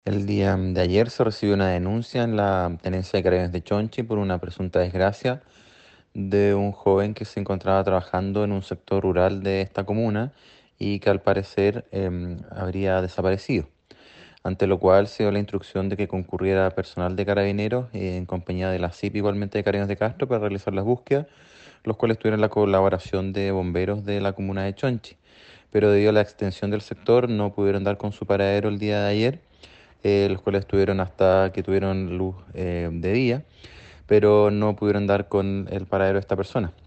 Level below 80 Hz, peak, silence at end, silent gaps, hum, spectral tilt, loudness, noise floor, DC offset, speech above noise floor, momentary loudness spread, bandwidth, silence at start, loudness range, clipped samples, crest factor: -50 dBFS; -4 dBFS; 0.15 s; none; none; -8 dB/octave; -23 LUFS; -53 dBFS; under 0.1%; 31 dB; 9 LU; 8.4 kHz; 0.05 s; 3 LU; under 0.1%; 18 dB